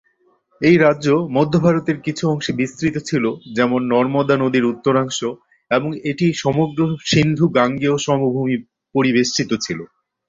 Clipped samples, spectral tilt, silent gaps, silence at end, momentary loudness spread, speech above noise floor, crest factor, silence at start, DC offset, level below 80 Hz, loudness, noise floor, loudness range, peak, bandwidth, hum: under 0.1%; -5.5 dB/octave; none; 0.45 s; 7 LU; 43 dB; 16 dB; 0.6 s; under 0.1%; -52 dBFS; -18 LUFS; -60 dBFS; 1 LU; -2 dBFS; 7.8 kHz; none